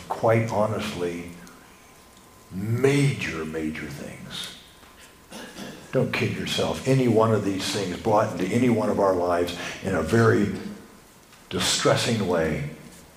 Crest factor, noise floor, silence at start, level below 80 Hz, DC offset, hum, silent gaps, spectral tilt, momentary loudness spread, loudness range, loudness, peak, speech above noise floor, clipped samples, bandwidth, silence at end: 20 dB; -51 dBFS; 0 s; -52 dBFS; under 0.1%; none; none; -5 dB/octave; 18 LU; 6 LU; -24 LUFS; -6 dBFS; 27 dB; under 0.1%; 15.5 kHz; 0.1 s